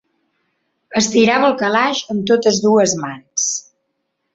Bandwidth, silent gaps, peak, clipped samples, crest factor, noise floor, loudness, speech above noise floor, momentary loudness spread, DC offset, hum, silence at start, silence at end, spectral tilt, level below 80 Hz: 8 kHz; none; -2 dBFS; under 0.1%; 16 dB; -72 dBFS; -16 LUFS; 56 dB; 10 LU; under 0.1%; none; 0.9 s; 0.75 s; -3 dB/octave; -58 dBFS